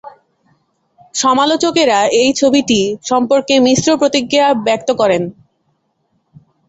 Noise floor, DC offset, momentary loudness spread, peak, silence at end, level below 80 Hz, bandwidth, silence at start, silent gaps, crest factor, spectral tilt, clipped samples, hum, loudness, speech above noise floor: -64 dBFS; under 0.1%; 5 LU; 0 dBFS; 1.4 s; -54 dBFS; 8.2 kHz; 0.05 s; none; 14 dB; -3.5 dB/octave; under 0.1%; none; -13 LUFS; 51 dB